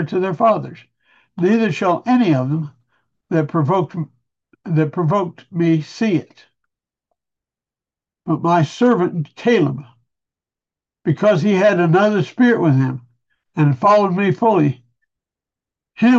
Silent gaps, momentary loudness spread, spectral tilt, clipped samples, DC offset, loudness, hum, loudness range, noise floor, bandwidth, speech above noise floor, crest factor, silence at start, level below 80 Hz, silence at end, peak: none; 12 LU; -8 dB/octave; under 0.1%; under 0.1%; -17 LUFS; none; 6 LU; -90 dBFS; 7.6 kHz; 73 dB; 14 dB; 0 s; -66 dBFS; 0 s; -4 dBFS